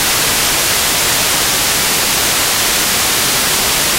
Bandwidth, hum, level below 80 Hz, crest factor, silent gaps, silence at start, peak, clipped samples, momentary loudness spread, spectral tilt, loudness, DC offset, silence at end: 16 kHz; none; -36 dBFS; 12 dB; none; 0 s; -2 dBFS; under 0.1%; 0 LU; -0.5 dB/octave; -11 LUFS; under 0.1%; 0 s